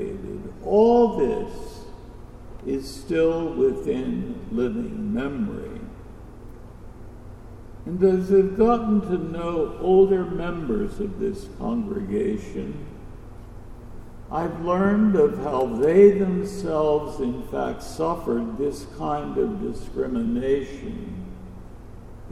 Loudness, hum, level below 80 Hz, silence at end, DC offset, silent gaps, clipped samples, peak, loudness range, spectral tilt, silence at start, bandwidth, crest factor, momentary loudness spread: -23 LUFS; 60 Hz at -50 dBFS; -40 dBFS; 0 s; under 0.1%; none; under 0.1%; -4 dBFS; 9 LU; -8 dB/octave; 0 s; 13 kHz; 20 dB; 26 LU